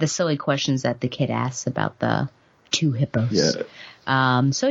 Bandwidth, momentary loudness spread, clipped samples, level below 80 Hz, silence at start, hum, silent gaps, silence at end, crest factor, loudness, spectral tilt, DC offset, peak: 8 kHz; 7 LU; under 0.1%; -60 dBFS; 0 s; none; none; 0 s; 18 dB; -23 LUFS; -5 dB/octave; under 0.1%; -4 dBFS